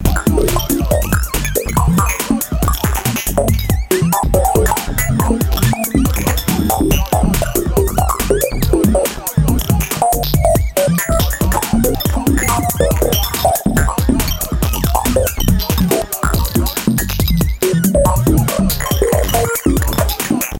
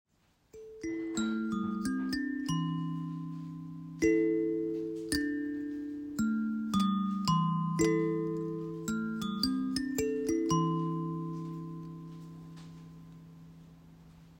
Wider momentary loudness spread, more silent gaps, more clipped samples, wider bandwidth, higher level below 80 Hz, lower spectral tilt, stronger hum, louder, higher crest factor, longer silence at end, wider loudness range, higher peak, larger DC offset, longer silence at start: second, 3 LU vs 19 LU; neither; neither; about the same, 17.5 kHz vs 16 kHz; first, -20 dBFS vs -60 dBFS; about the same, -5 dB/octave vs -6 dB/octave; neither; first, -15 LUFS vs -33 LUFS; about the same, 14 dB vs 18 dB; about the same, 0 s vs 0 s; second, 1 LU vs 4 LU; first, 0 dBFS vs -16 dBFS; neither; second, 0 s vs 0.55 s